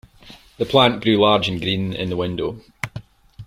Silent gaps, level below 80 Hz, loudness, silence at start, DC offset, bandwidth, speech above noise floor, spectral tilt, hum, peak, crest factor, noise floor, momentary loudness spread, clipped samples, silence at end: none; -48 dBFS; -19 LUFS; 0.25 s; under 0.1%; 15.5 kHz; 27 dB; -6 dB/octave; none; -2 dBFS; 20 dB; -46 dBFS; 15 LU; under 0.1%; 0 s